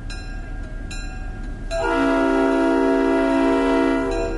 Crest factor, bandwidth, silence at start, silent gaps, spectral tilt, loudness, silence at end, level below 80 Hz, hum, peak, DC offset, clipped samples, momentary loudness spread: 14 dB; 11.5 kHz; 0 s; none; -6 dB/octave; -19 LUFS; 0 s; -32 dBFS; none; -6 dBFS; under 0.1%; under 0.1%; 16 LU